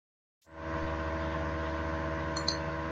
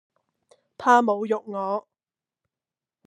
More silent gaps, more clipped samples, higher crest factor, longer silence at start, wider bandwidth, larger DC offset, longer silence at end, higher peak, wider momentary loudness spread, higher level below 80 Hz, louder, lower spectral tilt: neither; neither; about the same, 22 dB vs 22 dB; second, 0.5 s vs 0.8 s; second, 9.2 kHz vs 12 kHz; neither; second, 0 s vs 1.25 s; second, -12 dBFS vs -4 dBFS; second, 6 LU vs 10 LU; first, -44 dBFS vs -82 dBFS; second, -34 LUFS vs -23 LUFS; about the same, -5 dB/octave vs -5 dB/octave